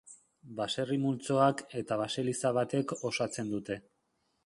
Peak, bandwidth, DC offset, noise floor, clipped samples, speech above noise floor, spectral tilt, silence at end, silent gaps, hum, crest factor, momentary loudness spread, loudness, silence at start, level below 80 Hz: -12 dBFS; 11.5 kHz; under 0.1%; -77 dBFS; under 0.1%; 45 dB; -5 dB/octave; 0.65 s; none; none; 20 dB; 11 LU; -32 LUFS; 0.05 s; -72 dBFS